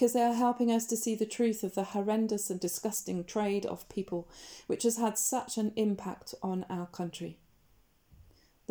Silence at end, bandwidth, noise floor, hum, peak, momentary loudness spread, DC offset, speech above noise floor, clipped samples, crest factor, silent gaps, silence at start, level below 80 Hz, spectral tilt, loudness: 0.5 s; over 20 kHz; -67 dBFS; none; -14 dBFS; 11 LU; under 0.1%; 35 dB; under 0.1%; 18 dB; none; 0 s; -68 dBFS; -4.5 dB/octave; -32 LUFS